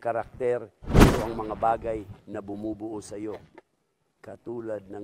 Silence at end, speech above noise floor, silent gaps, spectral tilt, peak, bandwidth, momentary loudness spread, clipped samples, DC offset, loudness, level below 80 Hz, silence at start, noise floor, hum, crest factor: 0 s; 43 dB; none; -6.5 dB/octave; -4 dBFS; 16 kHz; 19 LU; under 0.1%; under 0.1%; -27 LUFS; -34 dBFS; 0 s; -74 dBFS; none; 24 dB